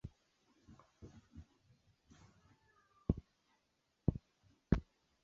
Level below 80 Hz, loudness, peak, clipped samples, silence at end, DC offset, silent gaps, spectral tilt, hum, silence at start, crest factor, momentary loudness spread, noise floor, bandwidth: -52 dBFS; -41 LUFS; -16 dBFS; under 0.1%; 0.4 s; under 0.1%; none; -9.5 dB/octave; none; 0.05 s; 30 dB; 22 LU; -82 dBFS; 7.2 kHz